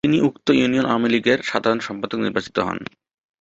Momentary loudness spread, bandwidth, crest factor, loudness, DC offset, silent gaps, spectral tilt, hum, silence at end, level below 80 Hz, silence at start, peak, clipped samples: 9 LU; 8 kHz; 18 dB; -20 LUFS; under 0.1%; none; -5.5 dB/octave; none; 0.55 s; -54 dBFS; 0.05 s; -2 dBFS; under 0.1%